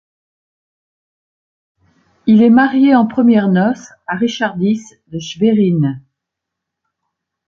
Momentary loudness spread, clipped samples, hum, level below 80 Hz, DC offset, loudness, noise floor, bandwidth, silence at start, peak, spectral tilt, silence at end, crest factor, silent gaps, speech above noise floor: 15 LU; under 0.1%; none; -56 dBFS; under 0.1%; -13 LUFS; -80 dBFS; 7.2 kHz; 2.25 s; -2 dBFS; -7 dB/octave; 1.5 s; 14 dB; none; 67 dB